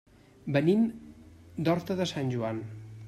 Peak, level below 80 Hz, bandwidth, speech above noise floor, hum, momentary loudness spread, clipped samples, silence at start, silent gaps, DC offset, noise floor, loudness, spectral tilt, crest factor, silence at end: -12 dBFS; -62 dBFS; 14 kHz; 23 dB; none; 18 LU; under 0.1%; 0.45 s; none; under 0.1%; -51 dBFS; -29 LUFS; -7 dB/octave; 18 dB; 0 s